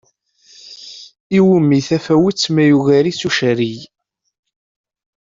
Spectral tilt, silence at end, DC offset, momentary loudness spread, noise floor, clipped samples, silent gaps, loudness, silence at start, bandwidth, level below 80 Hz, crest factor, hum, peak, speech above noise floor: -6 dB/octave; 1.45 s; under 0.1%; 21 LU; -53 dBFS; under 0.1%; 1.20-1.30 s; -14 LUFS; 0.65 s; 7.8 kHz; -56 dBFS; 14 dB; none; -2 dBFS; 39 dB